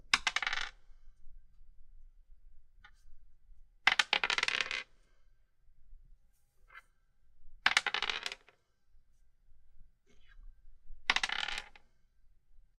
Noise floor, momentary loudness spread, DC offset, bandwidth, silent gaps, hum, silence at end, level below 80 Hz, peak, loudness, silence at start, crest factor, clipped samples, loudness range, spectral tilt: -67 dBFS; 14 LU; under 0.1%; 13.5 kHz; none; none; 0.2 s; -58 dBFS; -6 dBFS; -32 LUFS; 0.05 s; 34 dB; under 0.1%; 7 LU; 0.5 dB/octave